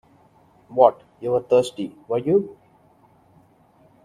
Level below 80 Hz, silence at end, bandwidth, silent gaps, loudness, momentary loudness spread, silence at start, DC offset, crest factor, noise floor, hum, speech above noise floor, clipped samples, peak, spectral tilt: -64 dBFS; 1.55 s; 11.5 kHz; none; -21 LUFS; 15 LU; 0.7 s; under 0.1%; 22 dB; -56 dBFS; none; 36 dB; under 0.1%; 0 dBFS; -6.5 dB/octave